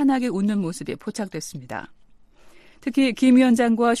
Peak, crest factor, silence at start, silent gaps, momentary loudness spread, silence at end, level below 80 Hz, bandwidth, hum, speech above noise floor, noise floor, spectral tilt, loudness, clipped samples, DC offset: -6 dBFS; 14 dB; 0 s; none; 17 LU; 0 s; -58 dBFS; 13 kHz; none; 30 dB; -50 dBFS; -5.5 dB/octave; -21 LUFS; under 0.1%; under 0.1%